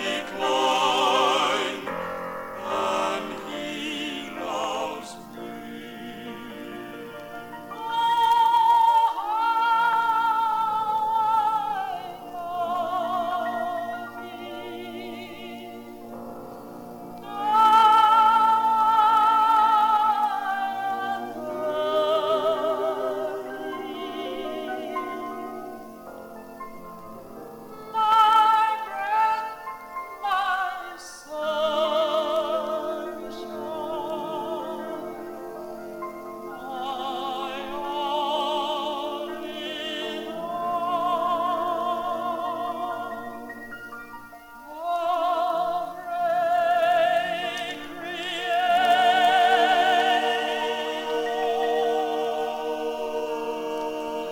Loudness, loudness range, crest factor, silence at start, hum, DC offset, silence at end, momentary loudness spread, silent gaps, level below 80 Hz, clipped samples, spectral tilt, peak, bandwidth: -24 LUFS; 12 LU; 18 dB; 0 s; none; under 0.1%; 0 s; 19 LU; none; -64 dBFS; under 0.1%; -3 dB/octave; -6 dBFS; 19 kHz